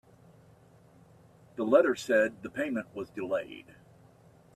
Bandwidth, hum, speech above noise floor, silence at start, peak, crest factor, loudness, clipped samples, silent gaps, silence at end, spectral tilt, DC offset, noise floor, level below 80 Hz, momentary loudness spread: 13.5 kHz; none; 30 dB; 1.55 s; -10 dBFS; 22 dB; -29 LUFS; under 0.1%; none; 0.95 s; -5 dB/octave; under 0.1%; -59 dBFS; -72 dBFS; 19 LU